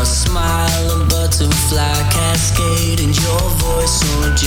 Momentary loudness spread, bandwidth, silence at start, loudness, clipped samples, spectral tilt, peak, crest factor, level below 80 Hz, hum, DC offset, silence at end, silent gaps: 1 LU; 19 kHz; 0 s; -15 LUFS; under 0.1%; -4 dB/octave; -4 dBFS; 10 dB; -20 dBFS; none; under 0.1%; 0 s; none